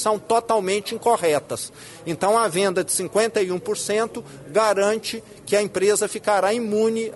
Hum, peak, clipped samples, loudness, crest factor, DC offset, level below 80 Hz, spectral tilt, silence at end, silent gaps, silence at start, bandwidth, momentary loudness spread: none; -6 dBFS; under 0.1%; -21 LUFS; 16 dB; under 0.1%; -62 dBFS; -3.5 dB/octave; 0 s; none; 0 s; 12 kHz; 11 LU